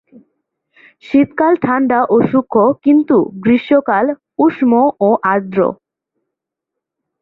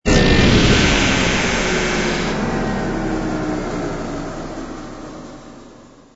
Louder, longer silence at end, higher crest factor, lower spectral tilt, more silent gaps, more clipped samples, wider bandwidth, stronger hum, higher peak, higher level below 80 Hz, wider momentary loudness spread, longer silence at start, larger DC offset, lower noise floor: first, -13 LUFS vs -17 LUFS; first, 1.5 s vs 0.35 s; about the same, 14 dB vs 16 dB; first, -9.5 dB/octave vs -4.5 dB/octave; neither; neither; second, 4.6 kHz vs 8 kHz; neither; about the same, -2 dBFS vs -2 dBFS; second, -56 dBFS vs -26 dBFS; second, 5 LU vs 20 LU; first, 1.1 s vs 0.05 s; neither; first, -80 dBFS vs -43 dBFS